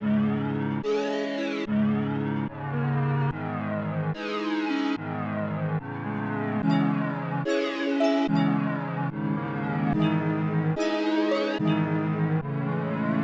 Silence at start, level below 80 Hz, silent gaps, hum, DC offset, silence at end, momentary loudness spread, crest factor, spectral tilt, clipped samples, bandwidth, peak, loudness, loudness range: 0 s; -58 dBFS; none; none; under 0.1%; 0 s; 6 LU; 14 dB; -8 dB/octave; under 0.1%; 7.6 kHz; -12 dBFS; -27 LUFS; 3 LU